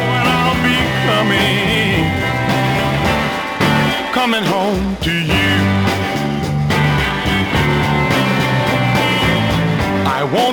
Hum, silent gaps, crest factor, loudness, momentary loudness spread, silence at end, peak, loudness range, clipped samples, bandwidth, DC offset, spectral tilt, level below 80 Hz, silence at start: none; none; 12 dB; -15 LUFS; 4 LU; 0 s; -2 dBFS; 1 LU; under 0.1%; over 20 kHz; under 0.1%; -5.5 dB/octave; -34 dBFS; 0 s